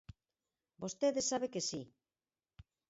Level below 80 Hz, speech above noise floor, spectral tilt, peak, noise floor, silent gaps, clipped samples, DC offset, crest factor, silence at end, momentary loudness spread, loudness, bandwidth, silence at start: -70 dBFS; over 53 dB; -4 dB/octave; -22 dBFS; under -90 dBFS; none; under 0.1%; under 0.1%; 20 dB; 0.3 s; 13 LU; -37 LUFS; 7.6 kHz; 0.1 s